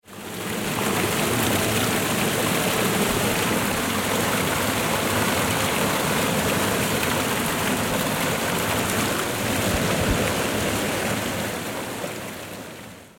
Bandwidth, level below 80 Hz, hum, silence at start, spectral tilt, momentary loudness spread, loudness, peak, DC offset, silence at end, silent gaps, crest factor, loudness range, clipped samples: 17 kHz; -42 dBFS; none; 0.05 s; -3.5 dB/octave; 8 LU; -22 LUFS; -6 dBFS; under 0.1%; 0.1 s; none; 16 dB; 2 LU; under 0.1%